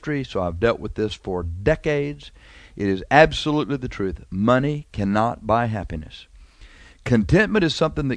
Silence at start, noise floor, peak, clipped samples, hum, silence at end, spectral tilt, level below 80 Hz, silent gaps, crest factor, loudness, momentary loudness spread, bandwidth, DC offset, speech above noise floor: 0 s; -46 dBFS; 0 dBFS; under 0.1%; none; 0 s; -6.5 dB/octave; -38 dBFS; none; 22 dB; -21 LUFS; 12 LU; 10.5 kHz; under 0.1%; 25 dB